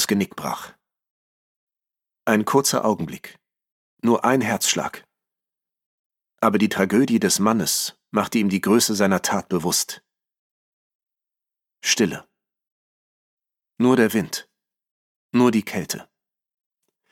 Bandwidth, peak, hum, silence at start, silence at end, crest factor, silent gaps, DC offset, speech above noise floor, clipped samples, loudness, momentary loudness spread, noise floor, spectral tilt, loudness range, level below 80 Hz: 17 kHz; -4 dBFS; none; 0 s; 1.1 s; 20 dB; 1.10-1.67 s, 3.72-3.97 s, 5.86-6.10 s, 10.39-11.00 s, 12.72-13.37 s, 14.91-15.29 s; under 0.1%; 68 dB; under 0.1%; -21 LUFS; 12 LU; -89 dBFS; -4 dB/octave; 6 LU; -64 dBFS